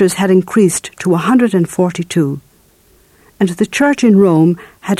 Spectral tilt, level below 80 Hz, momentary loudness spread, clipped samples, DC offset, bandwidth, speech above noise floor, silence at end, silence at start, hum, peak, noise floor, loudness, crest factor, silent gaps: -6 dB/octave; -54 dBFS; 9 LU; under 0.1%; under 0.1%; 14.5 kHz; 38 dB; 0.05 s; 0 s; none; 0 dBFS; -50 dBFS; -13 LUFS; 12 dB; none